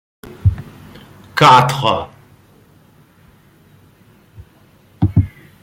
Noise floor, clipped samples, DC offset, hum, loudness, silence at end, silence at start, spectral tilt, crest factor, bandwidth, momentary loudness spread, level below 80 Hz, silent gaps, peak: -49 dBFS; under 0.1%; under 0.1%; none; -14 LUFS; 0.35 s; 0.3 s; -5.5 dB/octave; 18 dB; 16.5 kHz; 22 LU; -38 dBFS; none; 0 dBFS